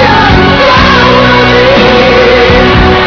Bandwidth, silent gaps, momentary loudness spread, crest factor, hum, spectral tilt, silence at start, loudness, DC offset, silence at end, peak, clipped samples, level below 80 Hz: 5.4 kHz; none; 1 LU; 4 dB; none; -6 dB/octave; 0 s; -4 LUFS; under 0.1%; 0 s; 0 dBFS; 20%; -18 dBFS